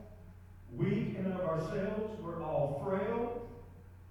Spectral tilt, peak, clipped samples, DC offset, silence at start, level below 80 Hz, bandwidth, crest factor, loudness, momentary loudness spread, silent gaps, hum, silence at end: -8.5 dB/octave; -20 dBFS; under 0.1%; under 0.1%; 0 s; -56 dBFS; 18 kHz; 16 dB; -36 LUFS; 21 LU; none; none; 0 s